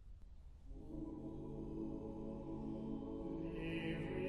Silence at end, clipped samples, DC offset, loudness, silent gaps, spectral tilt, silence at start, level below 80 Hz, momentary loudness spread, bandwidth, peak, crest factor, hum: 0 s; under 0.1%; under 0.1%; -47 LUFS; none; -8.5 dB/octave; 0 s; -56 dBFS; 16 LU; 11 kHz; -32 dBFS; 14 dB; none